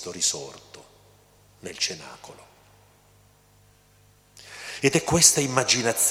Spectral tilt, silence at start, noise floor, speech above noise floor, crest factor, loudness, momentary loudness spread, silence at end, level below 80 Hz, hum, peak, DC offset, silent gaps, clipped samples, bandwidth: -2 dB/octave; 0 s; -58 dBFS; 34 dB; 26 dB; -21 LUFS; 26 LU; 0 s; -58 dBFS; 50 Hz at -60 dBFS; -2 dBFS; under 0.1%; none; under 0.1%; 17 kHz